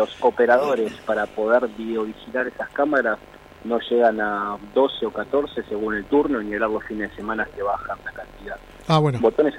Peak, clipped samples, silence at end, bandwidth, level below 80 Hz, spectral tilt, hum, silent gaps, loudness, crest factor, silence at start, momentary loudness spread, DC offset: -6 dBFS; under 0.1%; 0 s; 12.5 kHz; -50 dBFS; -7 dB/octave; none; none; -22 LUFS; 16 dB; 0 s; 12 LU; under 0.1%